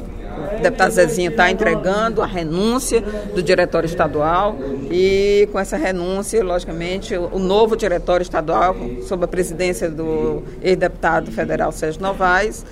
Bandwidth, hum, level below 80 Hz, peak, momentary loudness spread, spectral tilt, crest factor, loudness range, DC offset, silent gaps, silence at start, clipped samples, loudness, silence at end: 16 kHz; none; -34 dBFS; 0 dBFS; 8 LU; -5 dB/octave; 18 dB; 2 LU; under 0.1%; none; 0 s; under 0.1%; -18 LUFS; 0 s